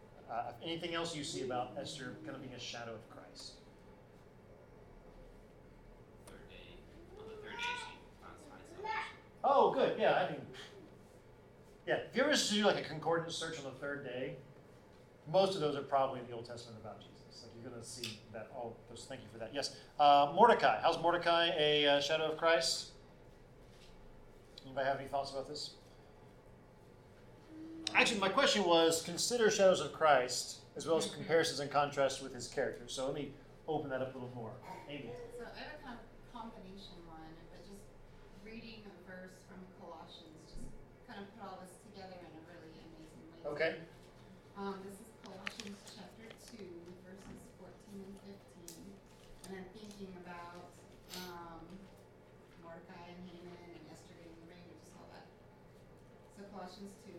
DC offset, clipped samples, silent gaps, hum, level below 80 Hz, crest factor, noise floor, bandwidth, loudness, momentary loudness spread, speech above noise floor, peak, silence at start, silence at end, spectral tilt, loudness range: under 0.1%; under 0.1%; none; none; -64 dBFS; 26 dB; -60 dBFS; 16 kHz; -35 LUFS; 25 LU; 25 dB; -12 dBFS; 0 s; 0 s; -3 dB/octave; 22 LU